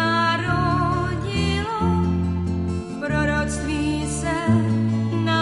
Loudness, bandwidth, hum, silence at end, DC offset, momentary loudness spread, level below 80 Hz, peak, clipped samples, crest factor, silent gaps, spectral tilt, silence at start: -22 LUFS; 11.5 kHz; none; 0 s; under 0.1%; 5 LU; -34 dBFS; -8 dBFS; under 0.1%; 14 dB; none; -6 dB/octave; 0 s